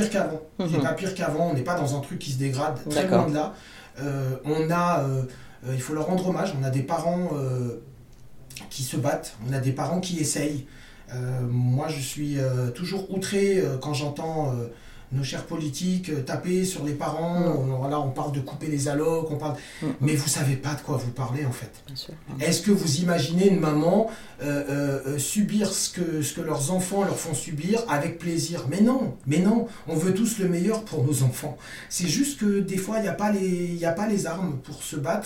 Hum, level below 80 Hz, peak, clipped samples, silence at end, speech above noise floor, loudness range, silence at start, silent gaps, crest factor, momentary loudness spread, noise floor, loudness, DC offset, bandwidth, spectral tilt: none; -54 dBFS; -4 dBFS; under 0.1%; 0 s; 21 dB; 4 LU; 0 s; none; 20 dB; 10 LU; -47 dBFS; -26 LUFS; under 0.1%; 16.5 kHz; -5.5 dB/octave